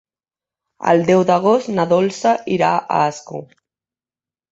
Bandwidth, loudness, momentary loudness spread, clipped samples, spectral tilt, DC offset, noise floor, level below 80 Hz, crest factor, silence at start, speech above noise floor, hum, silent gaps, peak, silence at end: 8 kHz; -16 LUFS; 12 LU; under 0.1%; -6 dB/octave; under 0.1%; under -90 dBFS; -60 dBFS; 16 dB; 0.8 s; over 74 dB; none; none; -2 dBFS; 1.1 s